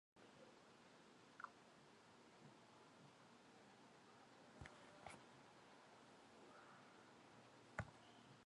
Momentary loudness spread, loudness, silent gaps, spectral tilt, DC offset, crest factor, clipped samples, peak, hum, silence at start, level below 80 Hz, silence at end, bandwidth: 8 LU; -64 LUFS; none; -4.5 dB/octave; under 0.1%; 34 dB; under 0.1%; -30 dBFS; none; 0.15 s; -80 dBFS; 0 s; 11 kHz